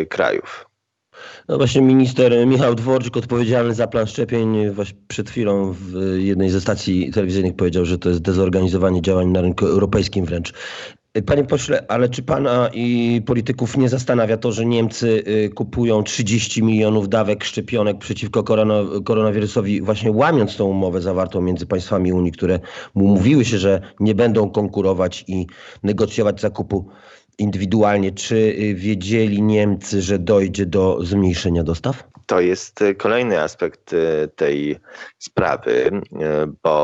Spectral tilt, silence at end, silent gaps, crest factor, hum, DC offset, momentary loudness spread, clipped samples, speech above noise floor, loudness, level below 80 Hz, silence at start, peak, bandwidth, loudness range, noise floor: -6.5 dB/octave; 0 s; none; 14 dB; none; under 0.1%; 8 LU; under 0.1%; 36 dB; -18 LUFS; -48 dBFS; 0 s; -2 dBFS; 8.2 kHz; 3 LU; -54 dBFS